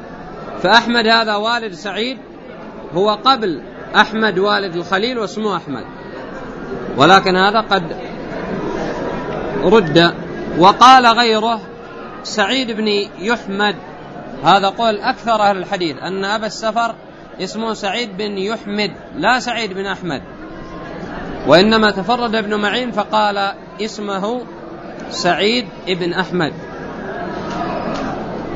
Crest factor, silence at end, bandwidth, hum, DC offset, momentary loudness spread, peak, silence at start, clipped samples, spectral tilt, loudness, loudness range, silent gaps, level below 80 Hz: 16 dB; 0 s; 11 kHz; none; under 0.1%; 18 LU; 0 dBFS; 0 s; under 0.1%; -4.5 dB/octave; -16 LUFS; 8 LU; none; -44 dBFS